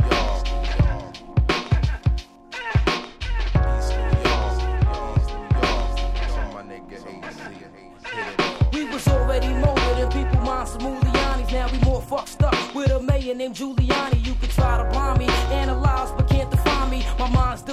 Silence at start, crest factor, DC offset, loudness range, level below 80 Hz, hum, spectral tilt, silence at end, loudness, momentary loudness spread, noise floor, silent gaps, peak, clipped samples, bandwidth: 0 s; 16 dB; under 0.1%; 4 LU; -24 dBFS; none; -6 dB/octave; 0 s; -23 LUFS; 10 LU; -42 dBFS; none; -4 dBFS; under 0.1%; 14 kHz